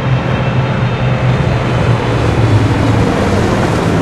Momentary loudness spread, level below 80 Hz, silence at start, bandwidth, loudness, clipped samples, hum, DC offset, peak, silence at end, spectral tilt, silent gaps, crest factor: 3 LU; -26 dBFS; 0 s; 12 kHz; -13 LUFS; under 0.1%; none; under 0.1%; 0 dBFS; 0 s; -7 dB/octave; none; 12 dB